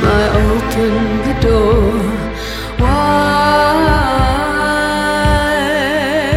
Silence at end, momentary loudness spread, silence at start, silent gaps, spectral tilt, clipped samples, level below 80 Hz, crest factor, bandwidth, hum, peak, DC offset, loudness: 0 s; 6 LU; 0 s; none; -5.5 dB/octave; under 0.1%; -22 dBFS; 12 dB; 16 kHz; none; 0 dBFS; under 0.1%; -13 LUFS